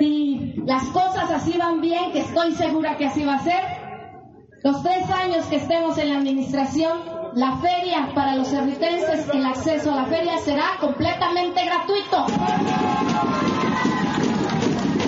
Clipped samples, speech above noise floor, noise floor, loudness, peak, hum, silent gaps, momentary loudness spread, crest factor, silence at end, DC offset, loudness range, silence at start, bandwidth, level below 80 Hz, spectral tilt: under 0.1%; 24 dB; -45 dBFS; -22 LUFS; -8 dBFS; none; none; 2 LU; 14 dB; 0 s; under 0.1%; 2 LU; 0 s; 8 kHz; -52 dBFS; -4 dB/octave